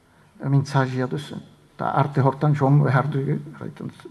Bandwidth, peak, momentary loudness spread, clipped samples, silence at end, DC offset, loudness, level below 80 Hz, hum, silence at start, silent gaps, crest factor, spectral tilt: 10.5 kHz; -4 dBFS; 17 LU; under 0.1%; 0 s; under 0.1%; -22 LUFS; -62 dBFS; none; 0.4 s; none; 18 dB; -8.5 dB/octave